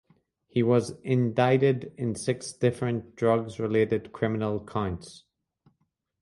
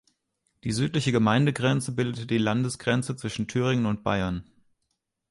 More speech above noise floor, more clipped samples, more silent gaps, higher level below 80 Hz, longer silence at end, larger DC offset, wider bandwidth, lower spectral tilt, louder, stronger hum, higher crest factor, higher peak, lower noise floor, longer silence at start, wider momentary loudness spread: second, 49 dB vs 54 dB; neither; neither; about the same, -56 dBFS vs -52 dBFS; first, 1.05 s vs 0.9 s; neither; about the same, 11.5 kHz vs 11.5 kHz; about the same, -7 dB/octave vs -6 dB/octave; about the same, -27 LUFS vs -26 LUFS; neither; about the same, 18 dB vs 18 dB; about the same, -10 dBFS vs -8 dBFS; second, -75 dBFS vs -79 dBFS; about the same, 0.55 s vs 0.65 s; about the same, 8 LU vs 9 LU